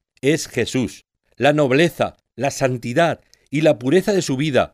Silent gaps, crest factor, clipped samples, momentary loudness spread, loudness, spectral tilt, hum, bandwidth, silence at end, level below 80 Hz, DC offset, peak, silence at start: none; 16 dB; under 0.1%; 9 LU; -19 LUFS; -5.5 dB/octave; none; 15.5 kHz; 0.05 s; -52 dBFS; under 0.1%; -4 dBFS; 0.25 s